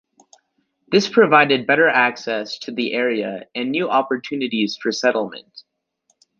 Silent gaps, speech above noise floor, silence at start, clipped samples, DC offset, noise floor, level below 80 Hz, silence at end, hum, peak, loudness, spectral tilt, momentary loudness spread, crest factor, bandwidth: none; 50 dB; 0.9 s; under 0.1%; under 0.1%; -68 dBFS; -68 dBFS; 0.8 s; none; -2 dBFS; -18 LUFS; -4.5 dB/octave; 12 LU; 18 dB; 7.4 kHz